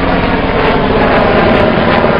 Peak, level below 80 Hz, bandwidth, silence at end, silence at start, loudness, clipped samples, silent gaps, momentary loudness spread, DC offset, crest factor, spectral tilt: 0 dBFS; -22 dBFS; 5.6 kHz; 0 s; 0 s; -10 LUFS; under 0.1%; none; 3 LU; under 0.1%; 10 dB; -8.5 dB/octave